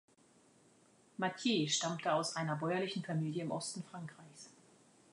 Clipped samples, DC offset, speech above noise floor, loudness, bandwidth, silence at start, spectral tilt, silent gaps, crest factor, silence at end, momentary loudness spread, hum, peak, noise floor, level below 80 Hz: under 0.1%; under 0.1%; 30 dB; -37 LUFS; 11 kHz; 1.2 s; -4 dB/octave; none; 18 dB; 0.6 s; 20 LU; none; -22 dBFS; -68 dBFS; -86 dBFS